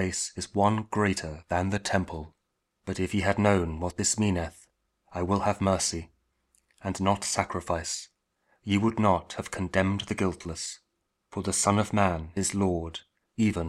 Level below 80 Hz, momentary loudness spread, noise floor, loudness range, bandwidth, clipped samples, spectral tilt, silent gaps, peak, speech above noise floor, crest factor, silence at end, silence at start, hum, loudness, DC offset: -50 dBFS; 14 LU; -79 dBFS; 2 LU; 14.5 kHz; under 0.1%; -4.5 dB/octave; none; -6 dBFS; 51 dB; 22 dB; 0 s; 0 s; none; -28 LUFS; under 0.1%